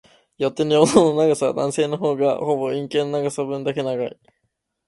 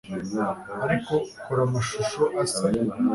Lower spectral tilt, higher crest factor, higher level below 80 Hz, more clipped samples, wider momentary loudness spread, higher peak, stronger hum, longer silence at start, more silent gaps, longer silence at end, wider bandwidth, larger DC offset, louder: about the same, -5.5 dB/octave vs -5.5 dB/octave; about the same, 20 dB vs 16 dB; second, -62 dBFS vs -54 dBFS; neither; first, 10 LU vs 5 LU; first, 0 dBFS vs -10 dBFS; neither; first, 0.4 s vs 0.05 s; neither; first, 0.8 s vs 0 s; about the same, 11.5 kHz vs 11.5 kHz; neither; first, -20 LUFS vs -26 LUFS